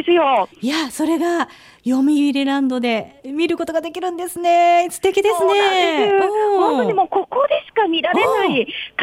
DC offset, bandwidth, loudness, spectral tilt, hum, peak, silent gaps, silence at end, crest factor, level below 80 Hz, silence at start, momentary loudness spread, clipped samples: under 0.1%; 16.5 kHz; -17 LUFS; -3.5 dB/octave; none; -6 dBFS; none; 0 s; 12 dB; -60 dBFS; 0 s; 8 LU; under 0.1%